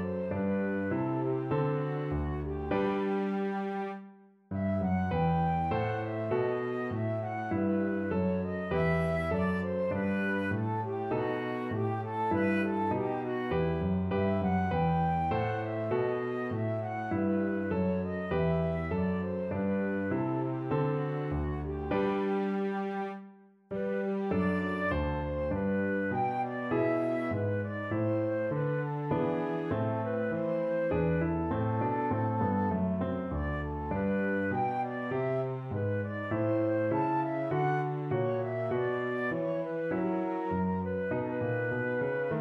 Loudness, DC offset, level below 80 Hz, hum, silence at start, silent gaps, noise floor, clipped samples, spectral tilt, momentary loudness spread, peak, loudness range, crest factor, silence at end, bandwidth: -32 LUFS; under 0.1%; -50 dBFS; none; 0 s; none; -54 dBFS; under 0.1%; -9.5 dB/octave; 5 LU; -18 dBFS; 2 LU; 14 dB; 0 s; 5.8 kHz